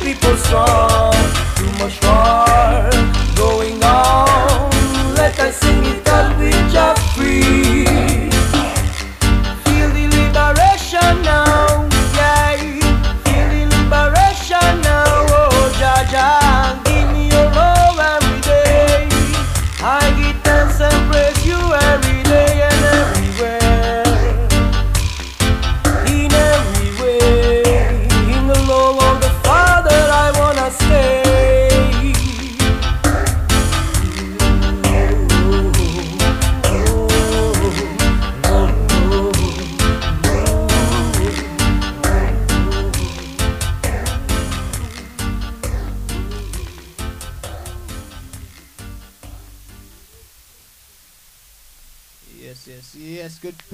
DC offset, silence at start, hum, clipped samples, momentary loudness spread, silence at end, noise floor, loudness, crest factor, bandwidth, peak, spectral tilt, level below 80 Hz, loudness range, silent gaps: under 0.1%; 0 s; none; under 0.1%; 10 LU; 0.2 s; -48 dBFS; -14 LUFS; 14 dB; 16 kHz; 0 dBFS; -4.5 dB/octave; -18 dBFS; 8 LU; none